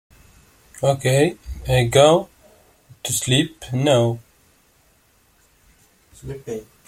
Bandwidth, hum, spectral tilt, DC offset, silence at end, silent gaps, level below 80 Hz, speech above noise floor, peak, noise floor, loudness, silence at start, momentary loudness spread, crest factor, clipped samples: 16 kHz; none; -4.5 dB/octave; under 0.1%; 0.25 s; none; -44 dBFS; 40 dB; -2 dBFS; -58 dBFS; -19 LUFS; 0.8 s; 20 LU; 20 dB; under 0.1%